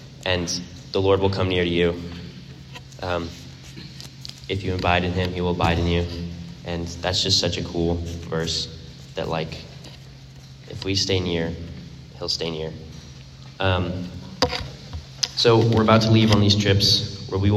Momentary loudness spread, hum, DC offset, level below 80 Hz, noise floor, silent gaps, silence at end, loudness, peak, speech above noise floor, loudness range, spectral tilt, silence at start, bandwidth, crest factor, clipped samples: 23 LU; none; under 0.1%; -46 dBFS; -42 dBFS; none; 0 s; -22 LUFS; 0 dBFS; 21 dB; 8 LU; -5 dB/octave; 0 s; 13 kHz; 22 dB; under 0.1%